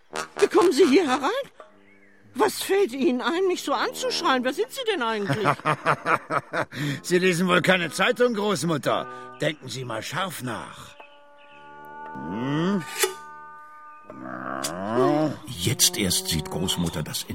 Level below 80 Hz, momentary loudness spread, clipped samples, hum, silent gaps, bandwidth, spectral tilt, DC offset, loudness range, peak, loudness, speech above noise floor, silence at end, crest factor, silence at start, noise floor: -56 dBFS; 19 LU; under 0.1%; none; none; 16.5 kHz; -4 dB/octave; 0.2%; 8 LU; -4 dBFS; -24 LUFS; 31 dB; 0 s; 22 dB; 0.15 s; -55 dBFS